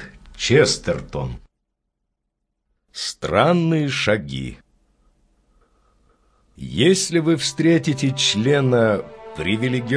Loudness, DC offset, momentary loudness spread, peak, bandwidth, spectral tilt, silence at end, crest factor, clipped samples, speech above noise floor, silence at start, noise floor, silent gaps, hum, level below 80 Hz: -19 LUFS; under 0.1%; 15 LU; -2 dBFS; 11 kHz; -4.5 dB/octave; 0 s; 20 dB; under 0.1%; 58 dB; 0 s; -77 dBFS; none; none; -46 dBFS